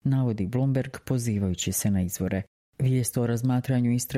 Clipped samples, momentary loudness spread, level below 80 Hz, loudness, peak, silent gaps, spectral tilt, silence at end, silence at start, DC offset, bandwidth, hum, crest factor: under 0.1%; 5 LU; -54 dBFS; -26 LUFS; -12 dBFS; 2.47-2.72 s; -6 dB/octave; 0 s; 0.05 s; under 0.1%; 15.5 kHz; none; 12 dB